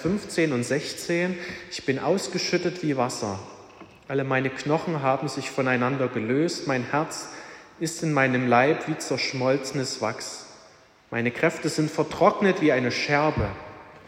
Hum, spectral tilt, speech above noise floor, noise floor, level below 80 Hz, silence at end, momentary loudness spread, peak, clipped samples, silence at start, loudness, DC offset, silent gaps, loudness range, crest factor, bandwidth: none; -5 dB/octave; 29 dB; -54 dBFS; -54 dBFS; 0 s; 12 LU; -6 dBFS; under 0.1%; 0 s; -25 LUFS; under 0.1%; none; 3 LU; 20 dB; 16 kHz